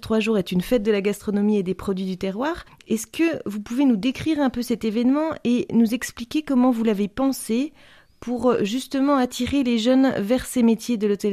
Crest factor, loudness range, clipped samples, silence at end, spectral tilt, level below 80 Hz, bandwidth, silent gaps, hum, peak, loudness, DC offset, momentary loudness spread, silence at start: 14 dB; 2 LU; under 0.1%; 0 s; -5.5 dB/octave; -50 dBFS; 15 kHz; none; none; -6 dBFS; -22 LUFS; under 0.1%; 8 LU; 0 s